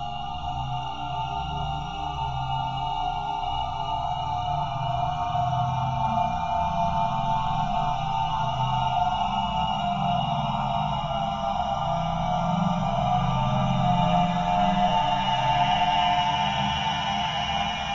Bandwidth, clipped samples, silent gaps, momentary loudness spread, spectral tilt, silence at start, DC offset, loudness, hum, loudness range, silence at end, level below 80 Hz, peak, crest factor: 7.6 kHz; under 0.1%; none; 7 LU; -6 dB/octave; 0 s; 0.7%; -26 LUFS; none; 6 LU; 0 s; -40 dBFS; -10 dBFS; 16 dB